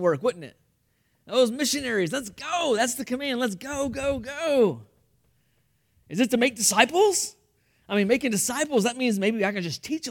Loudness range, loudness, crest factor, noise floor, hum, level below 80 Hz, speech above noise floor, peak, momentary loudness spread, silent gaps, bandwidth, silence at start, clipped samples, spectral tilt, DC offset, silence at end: 4 LU; -24 LUFS; 22 dB; -69 dBFS; none; -58 dBFS; 45 dB; -4 dBFS; 10 LU; none; 18 kHz; 0 s; under 0.1%; -3 dB/octave; under 0.1%; 0 s